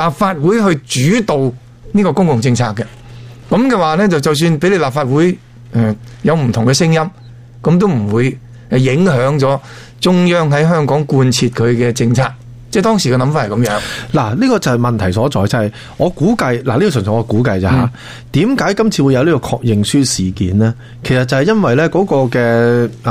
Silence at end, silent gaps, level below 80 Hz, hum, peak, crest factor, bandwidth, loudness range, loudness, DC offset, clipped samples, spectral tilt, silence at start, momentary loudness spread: 0 s; none; -40 dBFS; none; -2 dBFS; 10 dB; 15.5 kHz; 2 LU; -13 LUFS; under 0.1%; under 0.1%; -6 dB/octave; 0 s; 6 LU